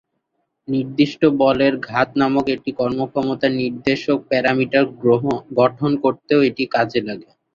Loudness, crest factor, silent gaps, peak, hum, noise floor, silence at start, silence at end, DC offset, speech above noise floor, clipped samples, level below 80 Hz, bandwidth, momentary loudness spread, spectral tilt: -18 LUFS; 16 dB; none; -2 dBFS; none; -72 dBFS; 0.7 s; 0.3 s; under 0.1%; 54 dB; under 0.1%; -56 dBFS; 7.2 kHz; 6 LU; -7 dB/octave